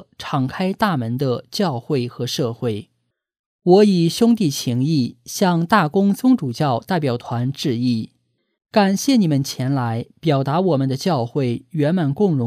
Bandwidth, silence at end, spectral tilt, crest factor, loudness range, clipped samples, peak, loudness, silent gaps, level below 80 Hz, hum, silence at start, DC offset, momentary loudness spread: 15.5 kHz; 0 s; -6 dB/octave; 18 dB; 3 LU; under 0.1%; -2 dBFS; -19 LUFS; 3.39-3.59 s; -60 dBFS; none; 0.2 s; under 0.1%; 8 LU